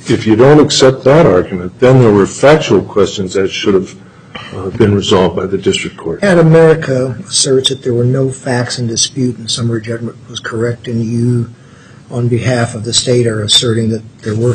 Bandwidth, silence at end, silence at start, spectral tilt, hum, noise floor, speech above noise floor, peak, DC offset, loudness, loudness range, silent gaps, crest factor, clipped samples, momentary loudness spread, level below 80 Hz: 11.5 kHz; 0 s; 0 s; -5 dB/octave; none; -37 dBFS; 27 dB; 0 dBFS; under 0.1%; -11 LUFS; 7 LU; none; 12 dB; under 0.1%; 13 LU; -42 dBFS